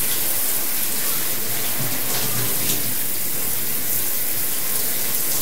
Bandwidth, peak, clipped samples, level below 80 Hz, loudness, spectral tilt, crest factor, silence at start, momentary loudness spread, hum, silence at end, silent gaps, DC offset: 16.5 kHz; -4 dBFS; under 0.1%; -52 dBFS; -20 LUFS; -1.5 dB/octave; 18 dB; 0 s; 2 LU; none; 0 s; none; 7%